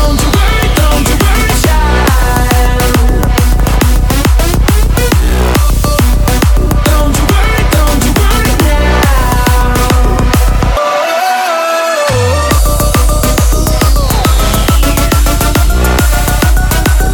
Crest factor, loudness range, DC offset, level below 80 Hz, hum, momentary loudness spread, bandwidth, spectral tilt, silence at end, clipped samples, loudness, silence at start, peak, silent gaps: 8 dB; 1 LU; under 0.1%; -10 dBFS; none; 1 LU; 19.5 kHz; -4.5 dB/octave; 0 s; under 0.1%; -10 LUFS; 0 s; 0 dBFS; none